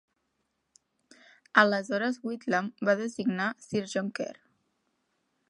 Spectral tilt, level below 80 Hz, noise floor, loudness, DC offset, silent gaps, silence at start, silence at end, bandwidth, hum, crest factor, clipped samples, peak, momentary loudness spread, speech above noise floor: -5 dB/octave; -78 dBFS; -79 dBFS; -29 LUFS; under 0.1%; none; 1.55 s; 1.15 s; 11.5 kHz; none; 26 dB; under 0.1%; -4 dBFS; 12 LU; 50 dB